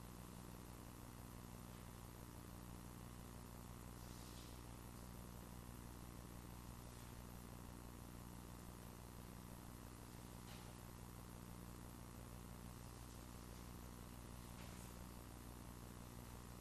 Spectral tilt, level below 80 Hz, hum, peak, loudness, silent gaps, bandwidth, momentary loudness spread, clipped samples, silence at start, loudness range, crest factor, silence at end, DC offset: -5 dB/octave; -62 dBFS; none; -40 dBFS; -57 LUFS; none; 13.5 kHz; 1 LU; under 0.1%; 0 s; 0 LU; 16 dB; 0 s; under 0.1%